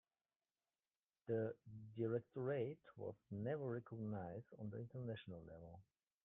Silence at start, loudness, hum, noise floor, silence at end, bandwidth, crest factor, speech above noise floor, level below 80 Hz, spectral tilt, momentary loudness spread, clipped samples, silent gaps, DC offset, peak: 1.25 s; -48 LUFS; none; under -90 dBFS; 0.45 s; 3.9 kHz; 18 dB; over 43 dB; -82 dBFS; -7 dB/octave; 13 LU; under 0.1%; none; under 0.1%; -32 dBFS